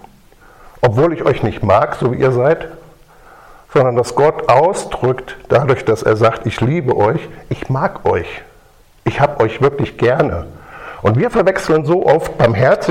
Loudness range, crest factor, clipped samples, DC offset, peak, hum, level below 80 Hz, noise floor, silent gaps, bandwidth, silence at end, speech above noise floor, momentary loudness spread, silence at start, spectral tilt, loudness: 3 LU; 14 dB; under 0.1%; under 0.1%; 0 dBFS; none; -40 dBFS; -47 dBFS; none; 14 kHz; 0 s; 33 dB; 11 LU; 0.8 s; -7 dB/octave; -15 LUFS